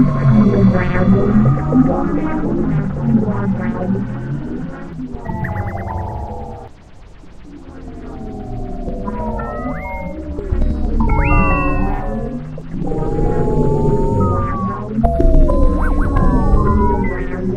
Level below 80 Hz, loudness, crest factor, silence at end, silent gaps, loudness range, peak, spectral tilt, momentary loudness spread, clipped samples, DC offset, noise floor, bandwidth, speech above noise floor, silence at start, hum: -20 dBFS; -18 LUFS; 16 dB; 0 s; none; 12 LU; 0 dBFS; -10 dB/octave; 14 LU; under 0.1%; under 0.1%; -38 dBFS; 5.4 kHz; 23 dB; 0 s; none